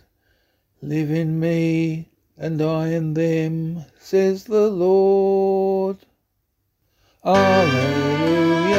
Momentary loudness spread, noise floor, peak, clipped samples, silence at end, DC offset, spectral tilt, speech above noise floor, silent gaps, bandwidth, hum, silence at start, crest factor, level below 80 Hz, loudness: 12 LU; -71 dBFS; -4 dBFS; under 0.1%; 0 s; under 0.1%; -7 dB/octave; 52 dB; none; 15 kHz; none; 0.8 s; 16 dB; -58 dBFS; -19 LUFS